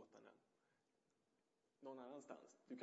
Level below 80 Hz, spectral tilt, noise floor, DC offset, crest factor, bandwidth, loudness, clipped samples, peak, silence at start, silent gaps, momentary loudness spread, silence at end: under -90 dBFS; -4.5 dB/octave; -87 dBFS; under 0.1%; 22 dB; 7.6 kHz; -60 LUFS; under 0.1%; -40 dBFS; 0 s; none; 10 LU; 0 s